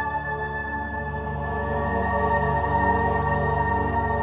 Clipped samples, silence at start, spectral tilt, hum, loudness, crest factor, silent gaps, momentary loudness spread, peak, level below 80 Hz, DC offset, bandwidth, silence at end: under 0.1%; 0 s; -11 dB/octave; none; -24 LUFS; 16 dB; none; 7 LU; -8 dBFS; -34 dBFS; under 0.1%; 4 kHz; 0 s